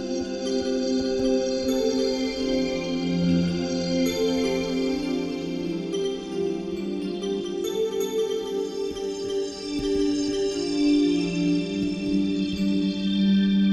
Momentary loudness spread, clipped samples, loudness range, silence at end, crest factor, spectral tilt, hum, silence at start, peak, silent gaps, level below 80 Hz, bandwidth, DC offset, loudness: 7 LU; under 0.1%; 4 LU; 0 s; 12 dB; -6 dB/octave; none; 0 s; -12 dBFS; none; -48 dBFS; 12.5 kHz; under 0.1%; -25 LUFS